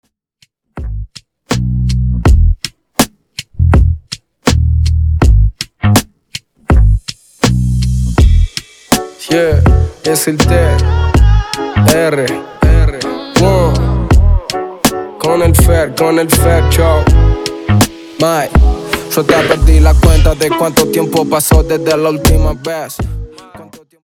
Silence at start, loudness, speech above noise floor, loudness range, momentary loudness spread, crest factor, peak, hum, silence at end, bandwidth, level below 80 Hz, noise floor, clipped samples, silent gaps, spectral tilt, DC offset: 0.75 s; -12 LUFS; 45 dB; 3 LU; 11 LU; 10 dB; 0 dBFS; none; 0.25 s; 19.5 kHz; -14 dBFS; -54 dBFS; under 0.1%; none; -5.5 dB/octave; under 0.1%